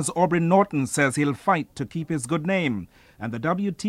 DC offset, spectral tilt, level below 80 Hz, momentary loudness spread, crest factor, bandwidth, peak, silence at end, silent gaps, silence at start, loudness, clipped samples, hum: under 0.1%; -5.5 dB/octave; -58 dBFS; 12 LU; 18 dB; 14 kHz; -6 dBFS; 0 s; none; 0 s; -24 LUFS; under 0.1%; none